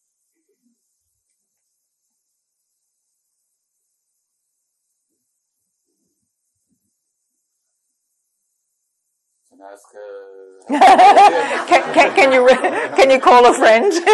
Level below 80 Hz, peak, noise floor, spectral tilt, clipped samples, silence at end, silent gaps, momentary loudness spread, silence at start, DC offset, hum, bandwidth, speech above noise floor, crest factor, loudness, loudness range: -60 dBFS; -2 dBFS; -74 dBFS; -2.5 dB/octave; under 0.1%; 0 s; none; 13 LU; 9.95 s; under 0.1%; none; 12 kHz; 62 dB; 16 dB; -11 LUFS; 6 LU